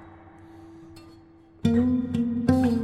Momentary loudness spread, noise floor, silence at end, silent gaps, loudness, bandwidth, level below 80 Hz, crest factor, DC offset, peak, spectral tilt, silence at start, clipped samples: 25 LU; -52 dBFS; 0 s; none; -24 LUFS; 10 kHz; -50 dBFS; 20 dB; under 0.1%; -6 dBFS; -8 dB/octave; 0 s; under 0.1%